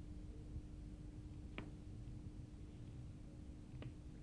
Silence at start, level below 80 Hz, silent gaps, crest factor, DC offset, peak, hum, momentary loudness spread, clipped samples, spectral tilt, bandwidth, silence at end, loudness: 0 s; -56 dBFS; none; 20 dB; under 0.1%; -32 dBFS; none; 3 LU; under 0.1%; -7 dB/octave; 10 kHz; 0 s; -55 LUFS